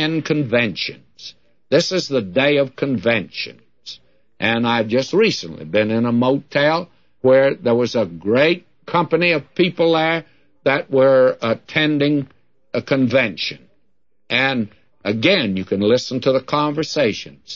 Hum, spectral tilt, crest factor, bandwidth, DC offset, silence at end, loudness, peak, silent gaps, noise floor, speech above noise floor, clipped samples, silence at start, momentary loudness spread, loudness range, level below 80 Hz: none; -5.5 dB/octave; 16 dB; 7.6 kHz; 0.2%; 0 s; -18 LUFS; -2 dBFS; none; -71 dBFS; 53 dB; under 0.1%; 0 s; 12 LU; 3 LU; -60 dBFS